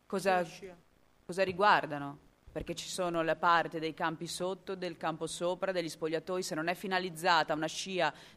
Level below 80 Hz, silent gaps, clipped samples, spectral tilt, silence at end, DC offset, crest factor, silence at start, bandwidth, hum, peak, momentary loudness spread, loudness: -64 dBFS; none; under 0.1%; -4 dB/octave; 0.05 s; under 0.1%; 20 dB; 0.1 s; 15.5 kHz; none; -12 dBFS; 13 LU; -33 LUFS